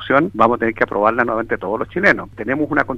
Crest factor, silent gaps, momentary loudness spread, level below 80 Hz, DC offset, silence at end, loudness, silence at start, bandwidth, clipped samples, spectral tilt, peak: 18 dB; none; 6 LU; -46 dBFS; under 0.1%; 0 s; -17 LUFS; 0 s; 8.8 kHz; under 0.1%; -7 dB/octave; 0 dBFS